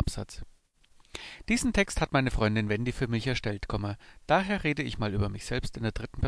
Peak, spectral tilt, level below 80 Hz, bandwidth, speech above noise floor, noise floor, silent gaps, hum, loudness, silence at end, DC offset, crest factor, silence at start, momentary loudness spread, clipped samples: -10 dBFS; -5.5 dB/octave; -40 dBFS; 11 kHz; 32 dB; -61 dBFS; none; none; -30 LUFS; 0 s; under 0.1%; 20 dB; 0 s; 15 LU; under 0.1%